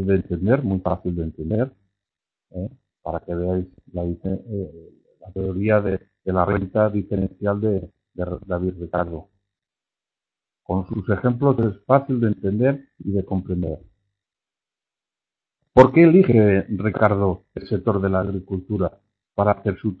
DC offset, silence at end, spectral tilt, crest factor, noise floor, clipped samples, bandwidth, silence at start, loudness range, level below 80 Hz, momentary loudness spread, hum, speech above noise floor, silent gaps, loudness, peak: under 0.1%; 0.05 s; -10.5 dB/octave; 22 dB; -90 dBFS; under 0.1%; 6 kHz; 0 s; 11 LU; -46 dBFS; 14 LU; none; 69 dB; none; -21 LUFS; 0 dBFS